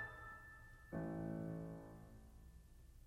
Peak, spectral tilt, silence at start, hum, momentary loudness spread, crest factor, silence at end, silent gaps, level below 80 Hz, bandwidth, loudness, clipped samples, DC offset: -34 dBFS; -8 dB/octave; 0 s; none; 18 LU; 16 dB; 0 s; none; -64 dBFS; 15 kHz; -50 LUFS; under 0.1%; under 0.1%